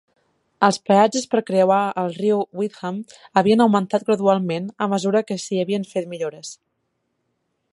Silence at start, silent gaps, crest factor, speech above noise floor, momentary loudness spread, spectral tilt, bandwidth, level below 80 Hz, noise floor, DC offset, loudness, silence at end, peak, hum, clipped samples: 0.6 s; none; 20 dB; 53 dB; 12 LU; -5.5 dB/octave; 11.5 kHz; -68 dBFS; -73 dBFS; under 0.1%; -20 LUFS; 1.2 s; -2 dBFS; none; under 0.1%